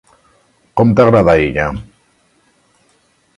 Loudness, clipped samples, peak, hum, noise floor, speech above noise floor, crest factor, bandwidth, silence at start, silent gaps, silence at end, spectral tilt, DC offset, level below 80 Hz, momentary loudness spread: -12 LUFS; under 0.1%; 0 dBFS; none; -57 dBFS; 46 dB; 16 dB; 10.5 kHz; 0.75 s; none; 1.55 s; -8 dB/octave; under 0.1%; -36 dBFS; 13 LU